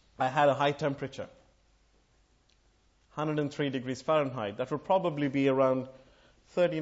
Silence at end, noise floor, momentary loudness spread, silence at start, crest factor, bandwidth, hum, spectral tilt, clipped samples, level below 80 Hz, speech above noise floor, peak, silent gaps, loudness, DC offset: 0 s; -67 dBFS; 13 LU; 0.2 s; 18 dB; 8 kHz; none; -6.5 dB/octave; under 0.1%; -68 dBFS; 38 dB; -12 dBFS; none; -30 LUFS; under 0.1%